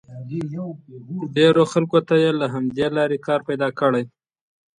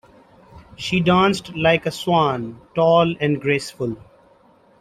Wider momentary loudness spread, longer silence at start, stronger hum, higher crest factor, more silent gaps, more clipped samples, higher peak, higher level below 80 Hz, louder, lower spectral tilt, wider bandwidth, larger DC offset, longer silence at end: first, 15 LU vs 12 LU; second, 0.1 s vs 0.55 s; neither; about the same, 18 dB vs 18 dB; neither; neither; about the same, -4 dBFS vs -2 dBFS; second, -62 dBFS vs -52 dBFS; about the same, -20 LUFS vs -19 LUFS; about the same, -6.5 dB/octave vs -6 dB/octave; second, 10.5 kHz vs 14.5 kHz; neither; second, 0.7 s vs 0.85 s